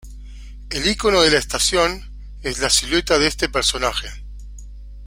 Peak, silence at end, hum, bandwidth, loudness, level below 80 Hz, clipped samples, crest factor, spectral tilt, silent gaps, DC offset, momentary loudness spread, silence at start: 0 dBFS; 0 s; 50 Hz at -35 dBFS; 16.5 kHz; -18 LUFS; -34 dBFS; under 0.1%; 20 dB; -2 dB/octave; none; under 0.1%; 23 LU; 0.05 s